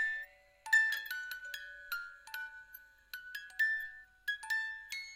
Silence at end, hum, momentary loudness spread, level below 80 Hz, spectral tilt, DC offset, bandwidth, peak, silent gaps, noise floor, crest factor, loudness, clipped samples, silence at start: 0 s; none; 21 LU; -74 dBFS; 3 dB/octave; under 0.1%; 16 kHz; -18 dBFS; none; -58 dBFS; 20 dB; -36 LUFS; under 0.1%; 0 s